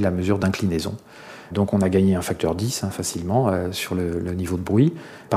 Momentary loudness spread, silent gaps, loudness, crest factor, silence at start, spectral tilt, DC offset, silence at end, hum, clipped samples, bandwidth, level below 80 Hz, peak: 11 LU; none; -22 LUFS; 18 dB; 0 s; -6 dB/octave; under 0.1%; 0 s; none; under 0.1%; 15.5 kHz; -46 dBFS; -6 dBFS